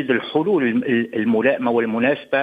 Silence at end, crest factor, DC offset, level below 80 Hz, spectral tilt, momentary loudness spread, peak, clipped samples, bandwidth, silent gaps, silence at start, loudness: 0 s; 14 dB; under 0.1%; -64 dBFS; -8 dB/octave; 2 LU; -4 dBFS; under 0.1%; 4.9 kHz; none; 0 s; -19 LUFS